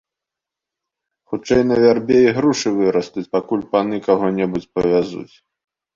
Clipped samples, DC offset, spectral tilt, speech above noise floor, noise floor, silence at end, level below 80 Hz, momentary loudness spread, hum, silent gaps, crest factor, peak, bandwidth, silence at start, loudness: under 0.1%; under 0.1%; -6 dB/octave; 68 dB; -85 dBFS; 0.7 s; -52 dBFS; 9 LU; none; none; 16 dB; -2 dBFS; 7.6 kHz; 1.3 s; -17 LUFS